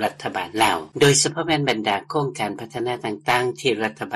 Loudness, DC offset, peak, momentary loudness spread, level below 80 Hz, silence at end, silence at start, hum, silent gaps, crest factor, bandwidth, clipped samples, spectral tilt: -21 LUFS; under 0.1%; -4 dBFS; 11 LU; -56 dBFS; 0 s; 0 s; none; none; 18 dB; 13 kHz; under 0.1%; -3.5 dB/octave